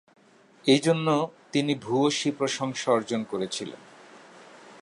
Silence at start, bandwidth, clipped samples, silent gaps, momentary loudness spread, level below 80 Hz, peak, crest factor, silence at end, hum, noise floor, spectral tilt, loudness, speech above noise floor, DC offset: 0.65 s; 11.5 kHz; under 0.1%; none; 10 LU; -74 dBFS; -8 dBFS; 20 dB; 0.05 s; none; -56 dBFS; -4.5 dB/octave; -26 LUFS; 31 dB; under 0.1%